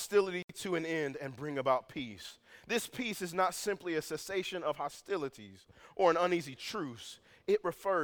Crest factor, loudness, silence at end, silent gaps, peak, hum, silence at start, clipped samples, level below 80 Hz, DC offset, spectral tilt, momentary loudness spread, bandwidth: 22 dB; -35 LUFS; 0 s; 0.44-0.48 s; -14 dBFS; none; 0 s; under 0.1%; -72 dBFS; under 0.1%; -4 dB/octave; 15 LU; over 20 kHz